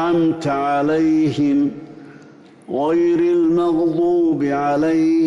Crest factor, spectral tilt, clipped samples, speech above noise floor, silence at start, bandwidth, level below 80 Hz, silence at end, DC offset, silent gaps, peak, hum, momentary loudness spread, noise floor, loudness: 8 dB; -7.5 dB/octave; under 0.1%; 27 dB; 0 s; 7.6 kHz; -56 dBFS; 0 s; under 0.1%; none; -10 dBFS; none; 4 LU; -44 dBFS; -17 LUFS